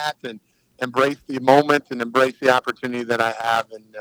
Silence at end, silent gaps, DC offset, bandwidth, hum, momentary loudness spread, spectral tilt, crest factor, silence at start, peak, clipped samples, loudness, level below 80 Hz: 0 s; none; under 0.1%; over 20 kHz; none; 13 LU; -4.5 dB/octave; 20 dB; 0 s; 0 dBFS; under 0.1%; -20 LUFS; -70 dBFS